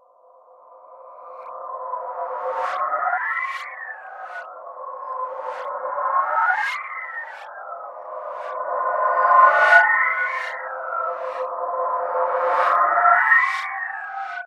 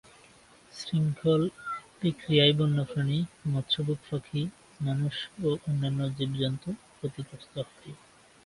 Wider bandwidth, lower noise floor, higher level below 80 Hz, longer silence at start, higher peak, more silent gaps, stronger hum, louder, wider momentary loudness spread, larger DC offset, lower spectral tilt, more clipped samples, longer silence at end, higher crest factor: about the same, 10.5 kHz vs 11.5 kHz; second, -52 dBFS vs -57 dBFS; second, -78 dBFS vs -62 dBFS; about the same, 0.7 s vs 0.75 s; first, 0 dBFS vs -8 dBFS; neither; neither; first, -20 LUFS vs -29 LUFS; first, 21 LU vs 14 LU; neither; second, -1 dB/octave vs -7 dB/octave; neither; second, 0 s vs 0.5 s; about the same, 22 dB vs 22 dB